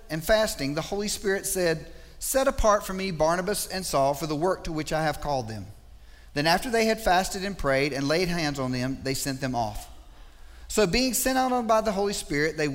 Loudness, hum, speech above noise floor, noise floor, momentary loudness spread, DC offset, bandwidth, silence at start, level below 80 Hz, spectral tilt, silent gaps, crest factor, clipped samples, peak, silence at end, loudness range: -26 LUFS; none; 22 dB; -48 dBFS; 7 LU; under 0.1%; 16 kHz; 0 s; -42 dBFS; -4 dB/octave; none; 18 dB; under 0.1%; -8 dBFS; 0 s; 2 LU